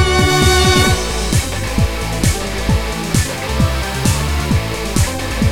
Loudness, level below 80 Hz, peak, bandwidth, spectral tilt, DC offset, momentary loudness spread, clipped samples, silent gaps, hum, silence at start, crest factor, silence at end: -16 LUFS; -22 dBFS; -2 dBFS; 17.5 kHz; -4 dB/octave; under 0.1%; 7 LU; under 0.1%; none; none; 0 s; 14 dB; 0 s